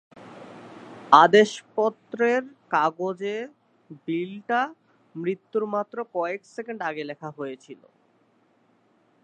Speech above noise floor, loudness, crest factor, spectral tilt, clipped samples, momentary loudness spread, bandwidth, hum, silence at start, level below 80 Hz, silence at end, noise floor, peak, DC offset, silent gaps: 40 dB; -24 LUFS; 26 dB; -5 dB/octave; under 0.1%; 26 LU; 9 kHz; none; 0.15 s; -82 dBFS; 1.5 s; -64 dBFS; 0 dBFS; under 0.1%; none